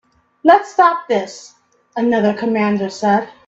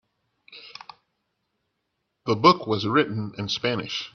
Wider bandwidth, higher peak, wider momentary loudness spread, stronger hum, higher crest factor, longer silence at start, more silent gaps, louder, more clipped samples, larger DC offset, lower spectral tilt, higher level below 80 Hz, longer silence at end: first, 8 kHz vs 7 kHz; about the same, 0 dBFS vs -2 dBFS; second, 11 LU vs 23 LU; neither; second, 16 dB vs 24 dB; about the same, 0.45 s vs 0.5 s; neither; first, -16 LUFS vs -23 LUFS; neither; neither; about the same, -6 dB/octave vs -5.5 dB/octave; about the same, -62 dBFS vs -64 dBFS; about the same, 0.15 s vs 0.05 s